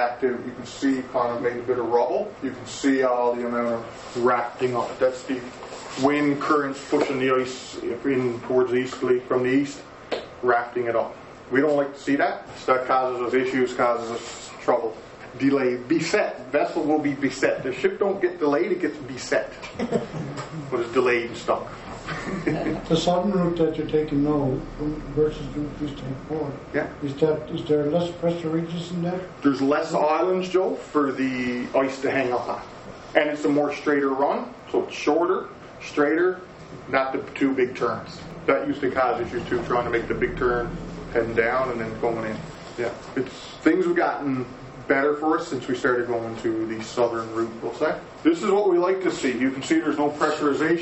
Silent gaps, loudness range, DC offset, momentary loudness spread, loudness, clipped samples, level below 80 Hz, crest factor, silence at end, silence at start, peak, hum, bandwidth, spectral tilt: none; 3 LU; under 0.1%; 10 LU; -24 LUFS; under 0.1%; -50 dBFS; 22 dB; 0 s; 0 s; -2 dBFS; none; 8.4 kHz; -6 dB/octave